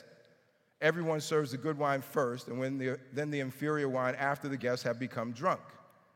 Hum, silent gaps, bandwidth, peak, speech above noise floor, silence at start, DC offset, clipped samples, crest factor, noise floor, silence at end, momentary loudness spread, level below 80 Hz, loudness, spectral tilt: none; none; 17 kHz; -14 dBFS; 36 dB; 0 s; under 0.1%; under 0.1%; 20 dB; -69 dBFS; 0.35 s; 5 LU; -84 dBFS; -34 LUFS; -5.5 dB/octave